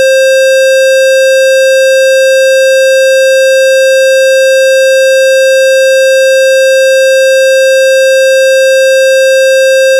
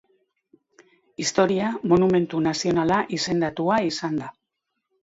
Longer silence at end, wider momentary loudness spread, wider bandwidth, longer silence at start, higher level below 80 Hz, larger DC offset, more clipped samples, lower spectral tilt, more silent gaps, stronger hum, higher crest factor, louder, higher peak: second, 0 s vs 0.75 s; second, 0 LU vs 9 LU; first, 16.5 kHz vs 8 kHz; second, 0 s vs 1.2 s; second, under -90 dBFS vs -58 dBFS; neither; neither; second, 5 dB/octave vs -5 dB/octave; neither; neither; second, 0 dB vs 18 dB; first, -5 LUFS vs -23 LUFS; about the same, -4 dBFS vs -6 dBFS